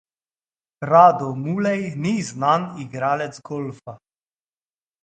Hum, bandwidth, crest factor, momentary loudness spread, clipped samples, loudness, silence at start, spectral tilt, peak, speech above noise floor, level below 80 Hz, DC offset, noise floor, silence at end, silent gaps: none; 9 kHz; 22 dB; 19 LU; under 0.1%; -20 LUFS; 0.8 s; -6.5 dB/octave; 0 dBFS; over 70 dB; -66 dBFS; under 0.1%; under -90 dBFS; 1.05 s; none